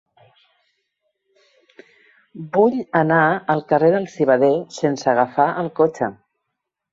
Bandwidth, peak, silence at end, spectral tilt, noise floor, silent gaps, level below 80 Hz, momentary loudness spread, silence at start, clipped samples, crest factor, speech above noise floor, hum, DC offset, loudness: 8 kHz; -2 dBFS; 0.8 s; -6.5 dB/octave; -79 dBFS; none; -66 dBFS; 7 LU; 2.35 s; under 0.1%; 18 dB; 62 dB; none; under 0.1%; -18 LUFS